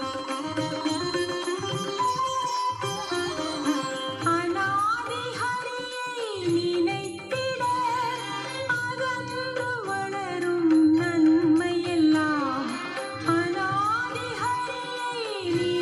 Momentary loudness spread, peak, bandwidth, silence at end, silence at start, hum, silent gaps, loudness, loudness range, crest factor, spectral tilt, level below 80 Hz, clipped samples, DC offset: 9 LU; -12 dBFS; 12 kHz; 0 s; 0 s; none; none; -26 LUFS; 5 LU; 14 dB; -4.5 dB/octave; -64 dBFS; under 0.1%; under 0.1%